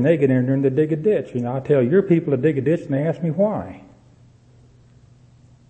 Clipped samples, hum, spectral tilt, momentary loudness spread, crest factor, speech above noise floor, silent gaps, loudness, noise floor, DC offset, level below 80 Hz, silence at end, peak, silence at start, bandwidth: under 0.1%; none; -10 dB/octave; 7 LU; 16 dB; 32 dB; none; -20 LUFS; -51 dBFS; under 0.1%; -58 dBFS; 1.9 s; -4 dBFS; 0 s; 8.6 kHz